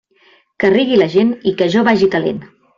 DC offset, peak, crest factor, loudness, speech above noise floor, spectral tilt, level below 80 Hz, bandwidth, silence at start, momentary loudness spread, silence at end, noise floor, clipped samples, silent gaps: under 0.1%; -2 dBFS; 12 dB; -14 LUFS; 39 dB; -6.5 dB/octave; -54 dBFS; 7.4 kHz; 0.6 s; 7 LU; 0.3 s; -52 dBFS; under 0.1%; none